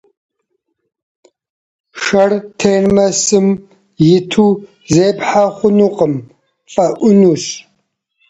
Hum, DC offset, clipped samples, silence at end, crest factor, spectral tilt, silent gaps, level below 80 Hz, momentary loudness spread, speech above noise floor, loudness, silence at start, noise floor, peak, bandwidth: none; under 0.1%; under 0.1%; 0.7 s; 14 dB; -5 dB/octave; none; -48 dBFS; 10 LU; 57 dB; -13 LUFS; 1.95 s; -69 dBFS; 0 dBFS; 8.2 kHz